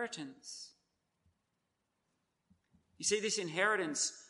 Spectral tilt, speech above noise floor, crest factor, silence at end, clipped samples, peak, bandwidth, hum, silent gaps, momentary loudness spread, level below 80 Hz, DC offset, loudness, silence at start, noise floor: -1.5 dB/octave; 47 dB; 22 dB; 0.05 s; under 0.1%; -18 dBFS; 11.5 kHz; none; none; 16 LU; -84 dBFS; under 0.1%; -34 LUFS; 0 s; -84 dBFS